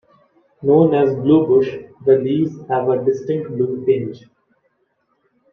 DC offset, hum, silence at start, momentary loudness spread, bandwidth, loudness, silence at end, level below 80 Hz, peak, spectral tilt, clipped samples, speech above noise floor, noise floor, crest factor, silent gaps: under 0.1%; none; 0.6 s; 10 LU; 6.4 kHz; -17 LUFS; 1.35 s; -60 dBFS; -2 dBFS; -9.5 dB/octave; under 0.1%; 50 dB; -66 dBFS; 16 dB; none